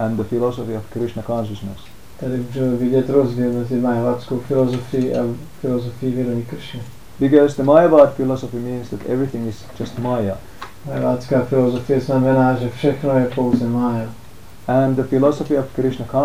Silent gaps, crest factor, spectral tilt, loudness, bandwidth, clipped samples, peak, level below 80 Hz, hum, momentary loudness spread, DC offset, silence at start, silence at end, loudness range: none; 18 dB; -8 dB/octave; -19 LUFS; 16 kHz; under 0.1%; 0 dBFS; -46 dBFS; none; 15 LU; 1%; 0 s; 0 s; 5 LU